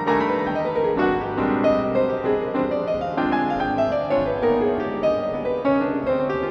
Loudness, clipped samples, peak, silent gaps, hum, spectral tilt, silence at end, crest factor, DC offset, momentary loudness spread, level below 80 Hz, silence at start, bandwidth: -22 LUFS; under 0.1%; -8 dBFS; none; none; -8 dB/octave; 0 s; 14 dB; under 0.1%; 3 LU; -46 dBFS; 0 s; 6.8 kHz